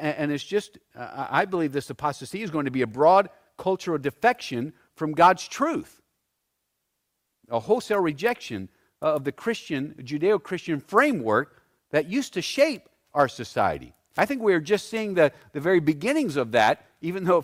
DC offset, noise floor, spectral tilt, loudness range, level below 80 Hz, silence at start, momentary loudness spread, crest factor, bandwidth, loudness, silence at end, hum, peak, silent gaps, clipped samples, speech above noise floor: under 0.1%; -78 dBFS; -5.5 dB/octave; 5 LU; -64 dBFS; 0 s; 12 LU; 18 dB; 16 kHz; -25 LUFS; 0 s; none; -6 dBFS; none; under 0.1%; 54 dB